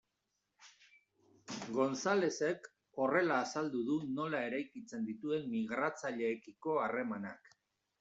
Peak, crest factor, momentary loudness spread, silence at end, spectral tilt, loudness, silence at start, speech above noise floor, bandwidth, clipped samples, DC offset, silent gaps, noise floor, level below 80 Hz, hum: -18 dBFS; 20 dB; 12 LU; 0.5 s; -5 dB/octave; -37 LUFS; 0.6 s; 49 dB; 8 kHz; under 0.1%; under 0.1%; none; -85 dBFS; -82 dBFS; none